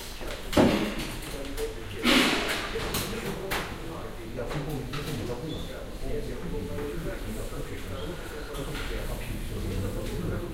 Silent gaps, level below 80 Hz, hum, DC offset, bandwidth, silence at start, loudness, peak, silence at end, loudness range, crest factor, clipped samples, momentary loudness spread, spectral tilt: none; -38 dBFS; none; under 0.1%; 16 kHz; 0 s; -31 LUFS; -8 dBFS; 0 s; 9 LU; 22 dB; under 0.1%; 14 LU; -4.5 dB/octave